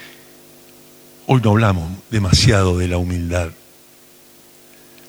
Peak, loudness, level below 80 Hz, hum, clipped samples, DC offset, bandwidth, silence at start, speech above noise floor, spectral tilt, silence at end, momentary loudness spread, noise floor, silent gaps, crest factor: 0 dBFS; -17 LUFS; -34 dBFS; 50 Hz at -40 dBFS; under 0.1%; under 0.1%; over 20 kHz; 0 s; 31 dB; -5.5 dB/octave; 1.55 s; 13 LU; -47 dBFS; none; 20 dB